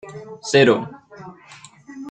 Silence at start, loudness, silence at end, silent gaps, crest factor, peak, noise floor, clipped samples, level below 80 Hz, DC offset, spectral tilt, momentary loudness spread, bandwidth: 0.05 s; -17 LUFS; 0 s; none; 20 dB; -2 dBFS; -45 dBFS; under 0.1%; -62 dBFS; under 0.1%; -5 dB/octave; 26 LU; 9.2 kHz